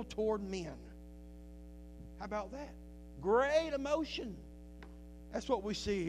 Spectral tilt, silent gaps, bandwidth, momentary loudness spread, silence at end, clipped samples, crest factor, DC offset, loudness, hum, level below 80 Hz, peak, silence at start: -5 dB/octave; none; 14.5 kHz; 22 LU; 0 s; under 0.1%; 20 dB; under 0.1%; -37 LUFS; none; -54 dBFS; -18 dBFS; 0 s